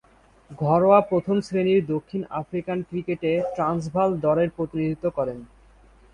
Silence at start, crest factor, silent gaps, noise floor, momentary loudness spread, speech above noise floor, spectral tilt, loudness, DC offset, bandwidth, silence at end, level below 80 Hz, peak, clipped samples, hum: 0.5 s; 20 dB; none; -53 dBFS; 11 LU; 30 dB; -8 dB/octave; -23 LUFS; under 0.1%; 10.5 kHz; 0.7 s; -54 dBFS; -4 dBFS; under 0.1%; none